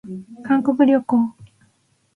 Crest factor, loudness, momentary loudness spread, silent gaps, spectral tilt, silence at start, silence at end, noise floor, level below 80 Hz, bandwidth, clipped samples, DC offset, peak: 16 dB; -18 LUFS; 17 LU; none; -8 dB/octave; 0.05 s; 0.7 s; -63 dBFS; -64 dBFS; 3.5 kHz; under 0.1%; under 0.1%; -4 dBFS